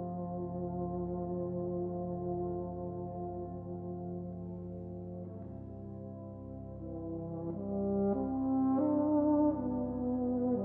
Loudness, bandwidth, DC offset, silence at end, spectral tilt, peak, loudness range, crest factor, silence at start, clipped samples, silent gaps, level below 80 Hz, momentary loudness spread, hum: -36 LUFS; 2.1 kHz; under 0.1%; 0 s; -13.5 dB/octave; -20 dBFS; 11 LU; 16 dB; 0 s; under 0.1%; none; -56 dBFS; 15 LU; none